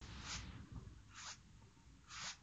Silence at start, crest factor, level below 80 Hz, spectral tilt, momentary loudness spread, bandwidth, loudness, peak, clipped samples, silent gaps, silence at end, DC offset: 0 s; 20 dB; -62 dBFS; -2 dB/octave; 17 LU; 9 kHz; -52 LUFS; -34 dBFS; under 0.1%; none; 0 s; under 0.1%